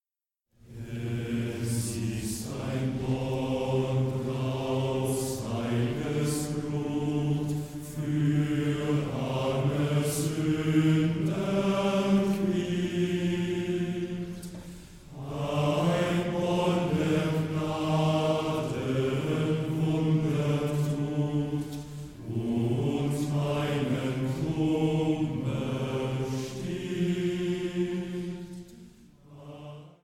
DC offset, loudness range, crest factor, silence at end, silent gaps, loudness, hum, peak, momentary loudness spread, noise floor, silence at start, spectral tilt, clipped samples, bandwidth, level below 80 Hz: under 0.1%; 4 LU; 16 dB; 0.15 s; none; -29 LUFS; none; -12 dBFS; 10 LU; under -90 dBFS; 0.65 s; -6.5 dB/octave; under 0.1%; 16.5 kHz; -54 dBFS